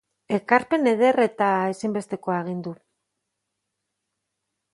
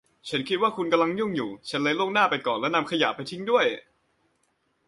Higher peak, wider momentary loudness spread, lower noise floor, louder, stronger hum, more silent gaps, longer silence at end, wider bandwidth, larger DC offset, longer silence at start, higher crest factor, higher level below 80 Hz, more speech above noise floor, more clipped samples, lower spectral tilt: first, -2 dBFS vs -8 dBFS; first, 11 LU vs 8 LU; first, -80 dBFS vs -71 dBFS; about the same, -23 LUFS vs -25 LUFS; first, 50 Hz at -55 dBFS vs none; neither; first, 2 s vs 1.05 s; about the same, 11.5 kHz vs 11.5 kHz; neither; about the same, 0.3 s vs 0.25 s; about the same, 22 dB vs 18 dB; about the same, -70 dBFS vs -70 dBFS; first, 58 dB vs 46 dB; neither; first, -6.5 dB/octave vs -5 dB/octave